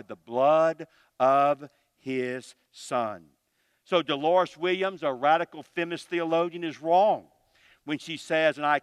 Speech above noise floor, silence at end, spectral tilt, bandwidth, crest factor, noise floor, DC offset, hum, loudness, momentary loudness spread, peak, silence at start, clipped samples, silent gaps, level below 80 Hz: 47 dB; 0.05 s; -5 dB/octave; 12 kHz; 18 dB; -73 dBFS; under 0.1%; none; -26 LUFS; 13 LU; -8 dBFS; 0.1 s; under 0.1%; none; -80 dBFS